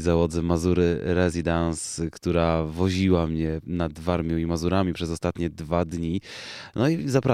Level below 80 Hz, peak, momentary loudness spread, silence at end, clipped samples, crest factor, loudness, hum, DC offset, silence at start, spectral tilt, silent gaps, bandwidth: -40 dBFS; -6 dBFS; 7 LU; 0 s; under 0.1%; 18 dB; -25 LUFS; none; under 0.1%; 0 s; -6.5 dB/octave; none; 13.5 kHz